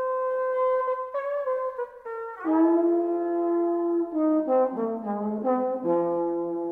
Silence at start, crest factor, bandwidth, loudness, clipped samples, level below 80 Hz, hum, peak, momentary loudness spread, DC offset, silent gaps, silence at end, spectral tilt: 0 s; 14 dB; 3.3 kHz; -26 LUFS; under 0.1%; -70 dBFS; none; -12 dBFS; 7 LU; under 0.1%; none; 0 s; -10 dB/octave